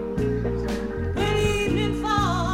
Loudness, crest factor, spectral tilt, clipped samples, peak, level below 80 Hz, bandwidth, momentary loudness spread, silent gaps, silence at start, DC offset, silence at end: -24 LUFS; 14 dB; -6 dB/octave; under 0.1%; -8 dBFS; -34 dBFS; 16.5 kHz; 6 LU; none; 0 s; under 0.1%; 0 s